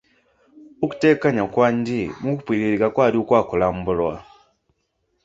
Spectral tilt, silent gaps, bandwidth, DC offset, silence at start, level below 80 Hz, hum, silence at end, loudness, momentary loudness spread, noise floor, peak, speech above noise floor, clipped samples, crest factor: -7.5 dB/octave; none; 7.8 kHz; under 0.1%; 0.6 s; -50 dBFS; none; 1 s; -20 LUFS; 9 LU; -71 dBFS; -2 dBFS; 51 dB; under 0.1%; 18 dB